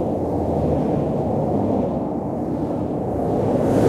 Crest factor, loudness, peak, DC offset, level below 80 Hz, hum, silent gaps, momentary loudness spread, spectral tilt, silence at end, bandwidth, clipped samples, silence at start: 16 dB; -22 LUFS; -4 dBFS; under 0.1%; -40 dBFS; none; none; 4 LU; -9.5 dB/octave; 0 s; 14 kHz; under 0.1%; 0 s